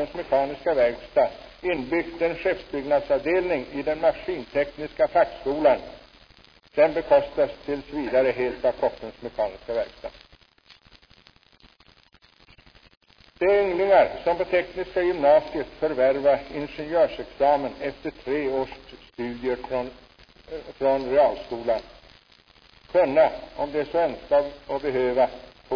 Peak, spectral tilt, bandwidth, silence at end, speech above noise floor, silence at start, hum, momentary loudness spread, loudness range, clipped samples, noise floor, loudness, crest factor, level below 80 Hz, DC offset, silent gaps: -6 dBFS; -7 dB/octave; 5.4 kHz; 0 s; 34 dB; 0 s; none; 12 LU; 7 LU; under 0.1%; -57 dBFS; -24 LUFS; 18 dB; -52 dBFS; under 0.1%; 12.97-13.01 s